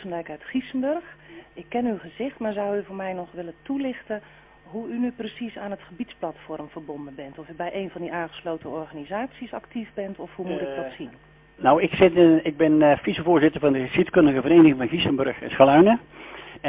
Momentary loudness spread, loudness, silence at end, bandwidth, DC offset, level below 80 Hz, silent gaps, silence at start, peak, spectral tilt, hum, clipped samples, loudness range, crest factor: 20 LU; -22 LUFS; 0 s; 3.9 kHz; under 0.1%; -56 dBFS; none; 0 s; -2 dBFS; -10.5 dB/octave; none; under 0.1%; 15 LU; 22 dB